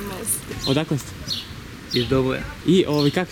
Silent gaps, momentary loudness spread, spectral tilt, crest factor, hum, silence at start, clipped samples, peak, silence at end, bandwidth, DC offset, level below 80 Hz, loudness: none; 9 LU; -4.5 dB/octave; 16 dB; none; 0 s; under 0.1%; -6 dBFS; 0 s; 19.5 kHz; under 0.1%; -42 dBFS; -22 LUFS